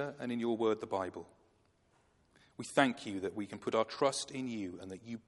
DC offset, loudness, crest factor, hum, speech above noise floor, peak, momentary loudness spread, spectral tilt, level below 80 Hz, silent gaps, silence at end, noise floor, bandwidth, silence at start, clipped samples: under 0.1%; -36 LUFS; 26 dB; none; 36 dB; -12 dBFS; 15 LU; -4.5 dB/octave; -78 dBFS; none; 0.05 s; -72 dBFS; 11.5 kHz; 0 s; under 0.1%